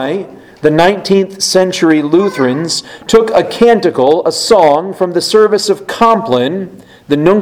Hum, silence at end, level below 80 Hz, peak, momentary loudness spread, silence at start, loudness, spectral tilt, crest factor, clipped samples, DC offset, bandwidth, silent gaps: none; 0 s; -46 dBFS; 0 dBFS; 8 LU; 0 s; -11 LUFS; -4.5 dB/octave; 10 dB; 0.7%; under 0.1%; 16 kHz; none